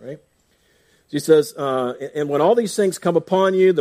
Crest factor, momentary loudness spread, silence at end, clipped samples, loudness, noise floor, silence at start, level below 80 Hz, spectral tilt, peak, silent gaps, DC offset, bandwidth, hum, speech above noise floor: 18 dB; 10 LU; 0 s; under 0.1%; -19 LUFS; -61 dBFS; 0 s; -68 dBFS; -5.5 dB/octave; -2 dBFS; none; under 0.1%; 15.5 kHz; none; 43 dB